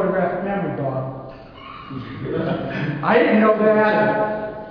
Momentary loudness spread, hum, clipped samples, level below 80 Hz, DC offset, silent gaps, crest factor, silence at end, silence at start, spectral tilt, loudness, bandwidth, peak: 20 LU; none; under 0.1%; -50 dBFS; under 0.1%; none; 18 dB; 0 s; 0 s; -9.5 dB/octave; -19 LUFS; 5.4 kHz; -2 dBFS